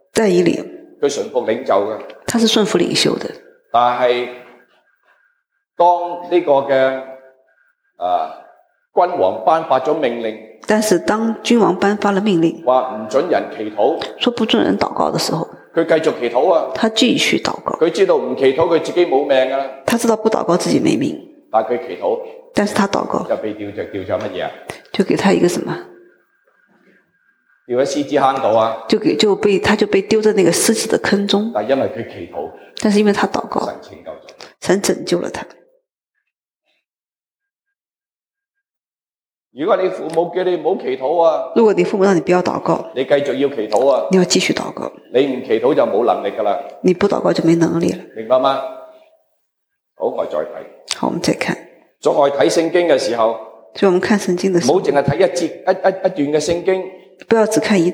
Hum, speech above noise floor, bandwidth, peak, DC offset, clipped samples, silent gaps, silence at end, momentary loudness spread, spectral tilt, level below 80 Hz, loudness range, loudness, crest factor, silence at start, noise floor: none; over 74 dB; 16.5 kHz; -2 dBFS; under 0.1%; under 0.1%; none; 0 s; 11 LU; -4.5 dB/octave; -56 dBFS; 6 LU; -16 LUFS; 16 dB; 0.15 s; under -90 dBFS